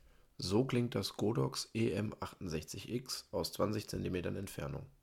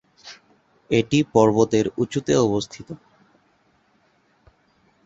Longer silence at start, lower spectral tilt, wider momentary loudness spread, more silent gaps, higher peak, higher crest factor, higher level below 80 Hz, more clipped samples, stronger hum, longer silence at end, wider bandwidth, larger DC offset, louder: first, 0.4 s vs 0.25 s; about the same, -5.5 dB/octave vs -6 dB/octave; second, 8 LU vs 24 LU; neither; second, -20 dBFS vs -2 dBFS; about the same, 18 dB vs 22 dB; second, -60 dBFS vs -54 dBFS; neither; neither; second, 0.15 s vs 2.1 s; first, 17 kHz vs 8 kHz; neither; second, -38 LUFS vs -20 LUFS